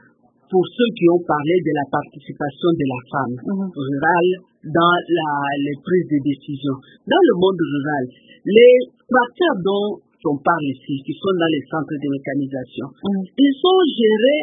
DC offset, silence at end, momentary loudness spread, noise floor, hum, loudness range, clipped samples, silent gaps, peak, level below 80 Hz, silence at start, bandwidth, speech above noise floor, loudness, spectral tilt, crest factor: under 0.1%; 0 s; 11 LU; -55 dBFS; none; 5 LU; under 0.1%; none; 0 dBFS; -62 dBFS; 0.5 s; 3.9 kHz; 37 dB; -18 LUFS; -11.5 dB/octave; 18 dB